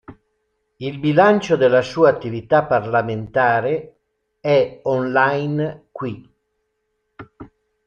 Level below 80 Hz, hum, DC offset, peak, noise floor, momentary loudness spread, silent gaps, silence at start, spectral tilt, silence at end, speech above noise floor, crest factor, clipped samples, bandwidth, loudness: -56 dBFS; none; under 0.1%; -2 dBFS; -72 dBFS; 15 LU; none; 0.1 s; -7 dB/octave; 0.4 s; 54 dB; 18 dB; under 0.1%; 7.2 kHz; -18 LUFS